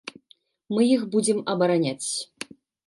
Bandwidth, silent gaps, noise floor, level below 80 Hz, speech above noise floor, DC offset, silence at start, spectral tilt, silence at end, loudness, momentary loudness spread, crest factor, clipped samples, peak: 11.5 kHz; none; -61 dBFS; -74 dBFS; 38 dB; under 0.1%; 0.05 s; -4.5 dB/octave; 0.45 s; -24 LUFS; 18 LU; 16 dB; under 0.1%; -8 dBFS